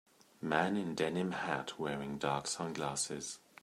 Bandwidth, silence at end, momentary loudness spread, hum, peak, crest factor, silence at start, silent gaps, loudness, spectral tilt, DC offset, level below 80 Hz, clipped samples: 15 kHz; 0.25 s; 6 LU; none; -14 dBFS; 24 dB; 0.4 s; none; -37 LUFS; -4 dB/octave; under 0.1%; -70 dBFS; under 0.1%